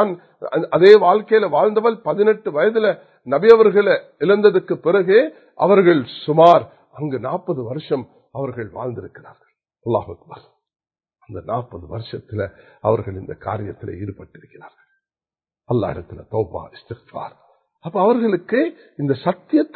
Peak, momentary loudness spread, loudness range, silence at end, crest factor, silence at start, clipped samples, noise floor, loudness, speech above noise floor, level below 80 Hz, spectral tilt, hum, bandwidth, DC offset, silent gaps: 0 dBFS; 21 LU; 14 LU; 0.1 s; 18 dB; 0 s; under 0.1%; under -90 dBFS; -17 LUFS; over 72 dB; -52 dBFS; -8.5 dB/octave; none; 5.6 kHz; under 0.1%; none